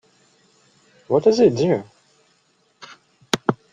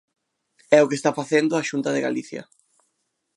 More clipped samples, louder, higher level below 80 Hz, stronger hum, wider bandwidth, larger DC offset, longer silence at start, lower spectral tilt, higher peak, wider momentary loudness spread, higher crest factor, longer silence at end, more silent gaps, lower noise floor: neither; about the same, -19 LUFS vs -21 LUFS; first, -60 dBFS vs -76 dBFS; neither; about the same, 11.5 kHz vs 11.5 kHz; neither; first, 1.1 s vs 0.7 s; about the same, -5.5 dB/octave vs -5 dB/octave; about the same, -2 dBFS vs 0 dBFS; second, 9 LU vs 13 LU; about the same, 20 dB vs 22 dB; second, 0.2 s vs 0.95 s; neither; second, -63 dBFS vs -75 dBFS